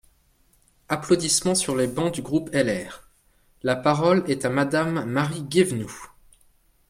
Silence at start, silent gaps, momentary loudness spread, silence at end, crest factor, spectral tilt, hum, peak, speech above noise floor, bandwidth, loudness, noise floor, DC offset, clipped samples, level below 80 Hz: 0.9 s; none; 11 LU; 0.8 s; 18 dB; -4.5 dB/octave; none; -6 dBFS; 39 dB; 16 kHz; -23 LUFS; -62 dBFS; under 0.1%; under 0.1%; -56 dBFS